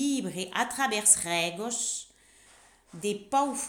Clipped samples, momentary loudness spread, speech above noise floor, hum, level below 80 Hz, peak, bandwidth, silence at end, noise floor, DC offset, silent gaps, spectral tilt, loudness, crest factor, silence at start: under 0.1%; 13 LU; 30 dB; none; -66 dBFS; -6 dBFS; over 20 kHz; 0 s; -58 dBFS; under 0.1%; none; -1.5 dB/octave; -27 LUFS; 24 dB; 0 s